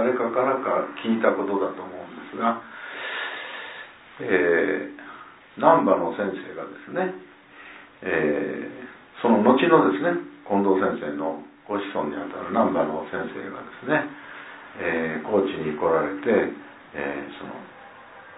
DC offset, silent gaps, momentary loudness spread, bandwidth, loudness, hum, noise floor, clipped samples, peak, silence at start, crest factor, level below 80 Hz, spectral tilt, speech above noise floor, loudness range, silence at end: under 0.1%; none; 21 LU; 4 kHz; -24 LUFS; none; -46 dBFS; under 0.1%; -2 dBFS; 0 s; 24 dB; -64 dBFS; -10 dB/octave; 22 dB; 5 LU; 0 s